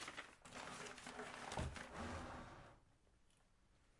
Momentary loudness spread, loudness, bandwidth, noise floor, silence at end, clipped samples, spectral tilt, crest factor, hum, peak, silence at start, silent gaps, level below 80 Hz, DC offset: 10 LU; -52 LUFS; 11.5 kHz; -74 dBFS; 0 s; under 0.1%; -4 dB/octave; 20 dB; none; -34 dBFS; 0 s; none; -64 dBFS; under 0.1%